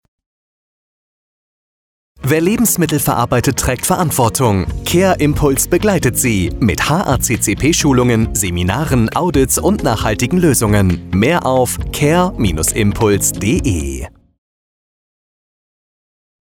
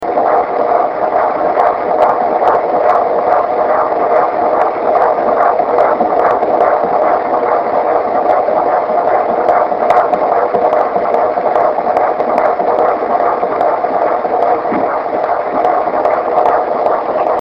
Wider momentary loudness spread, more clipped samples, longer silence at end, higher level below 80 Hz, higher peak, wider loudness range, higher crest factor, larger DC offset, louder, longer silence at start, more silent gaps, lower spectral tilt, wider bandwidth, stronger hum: about the same, 4 LU vs 2 LU; neither; first, 2.35 s vs 0 s; first, -30 dBFS vs -50 dBFS; about the same, -2 dBFS vs 0 dBFS; about the same, 4 LU vs 2 LU; about the same, 12 dB vs 12 dB; neither; about the same, -14 LUFS vs -12 LUFS; first, 2.2 s vs 0 s; neither; second, -5 dB/octave vs -7 dB/octave; first, 19 kHz vs 5.8 kHz; neither